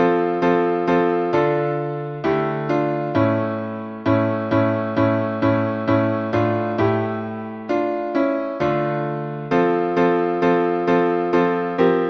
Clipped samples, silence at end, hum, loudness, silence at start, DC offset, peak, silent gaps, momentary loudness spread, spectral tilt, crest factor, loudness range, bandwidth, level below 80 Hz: under 0.1%; 0 s; none; -20 LUFS; 0 s; under 0.1%; -4 dBFS; none; 6 LU; -8.5 dB/octave; 14 dB; 2 LU; 6.2 kHz; -54 dBFS